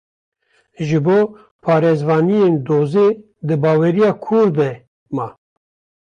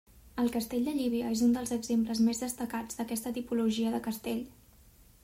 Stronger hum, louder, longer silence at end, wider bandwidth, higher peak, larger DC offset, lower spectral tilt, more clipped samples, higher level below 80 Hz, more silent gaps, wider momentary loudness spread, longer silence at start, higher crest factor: neither; first, -16 LUFS vs -32 LUFS; about the same, 0.7 s vs 0.75 s; second, 9.2 kHz vs 16 kHz; first, -4 dBFS vs -18 dBFS; neither; first, -9 dB/octave vs -4.5 dB/octave; neither; about the same, -58 dBFS vs -60 dBFS; first, 1.51-1.59 s, 4.87-5.06 s vs none; first, 12 LU vs 8 LU; first, 0.8 s vs 0.15 s; about the same, 12 dB vs 14 dB